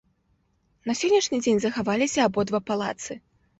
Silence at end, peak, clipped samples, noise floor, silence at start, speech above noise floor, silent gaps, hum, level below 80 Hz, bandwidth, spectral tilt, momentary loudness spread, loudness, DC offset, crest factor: 0.4 s; -10 dBFS; under 0.1%; -68 dBFS; 0.85 s; 44 dB; none; none; -62 dBFS; 8.2 kHz; -4 dB/octave; 14 LU; -24 LUFS; under 0.1%; 16 dB